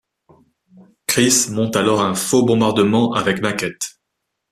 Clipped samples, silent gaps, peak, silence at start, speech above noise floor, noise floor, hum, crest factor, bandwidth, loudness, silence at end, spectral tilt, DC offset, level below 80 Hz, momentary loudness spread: under 0.1%; none; -2 dBFS; 1.1 s; 60 dB; -77 dBFS; none; 18 dB; 15.5 kHz; -16 LUFS; 0.6 s; -4 dB/octave; under 0.1%; -56 dBFS; 10 LU